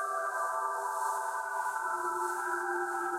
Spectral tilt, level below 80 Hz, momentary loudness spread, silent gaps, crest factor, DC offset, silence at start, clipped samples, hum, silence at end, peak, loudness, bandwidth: -1.5 dB/octave; -82 dBFS; 1 LU; none; 12 dB; under 0.1%; 0 s; under 0.1%; none; 0 s; -22 dBFS; -33 LUFS; 16.5 kHz